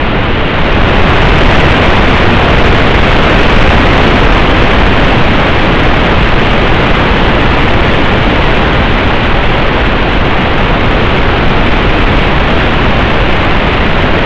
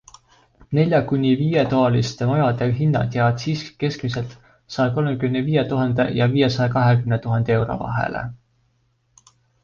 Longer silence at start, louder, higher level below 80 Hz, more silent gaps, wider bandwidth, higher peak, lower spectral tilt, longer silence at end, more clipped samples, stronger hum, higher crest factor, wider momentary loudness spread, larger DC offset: second, 0 s vs 0.7 s; first, -8 LUFS vs -20 LUFS; first, -12 dBFS vs -48 dBFS; neither; first, 8 kHz vs 7.2 kHz; first, 0 dBFS vs -4 dBFS; about the same, -6.5 dB/octave vs -7.5 dB/octave; second, 0 s vs 1.3 s; neither; neither; second, 6 dB vs 16 dB; second, 3 LU vs 8 LU; neither